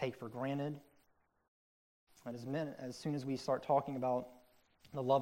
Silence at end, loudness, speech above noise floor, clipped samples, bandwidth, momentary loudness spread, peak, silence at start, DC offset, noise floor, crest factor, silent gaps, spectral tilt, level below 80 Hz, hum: 0 s; -39 LUFS; 37 dB; under 0.1%; 16 kHz; 14 LU; -20 dBFS; 0 s; under 0.1%; -75 dBFS; 20 dB; 1.48-2.07 s; -7 dB/octave; -78 dBFS; none